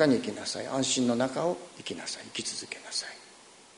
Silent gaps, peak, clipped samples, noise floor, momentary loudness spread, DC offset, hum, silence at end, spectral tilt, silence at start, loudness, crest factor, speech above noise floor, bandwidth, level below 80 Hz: none; -10 dBFS; under 0.1%; -54 dBFS; 13 LU; under 0.1%; none; 0.15 s; -3.5 dB/octave; 0 s; -31 LUFS; 22 dB; 23 dB; 11 kHz; -70 dBFS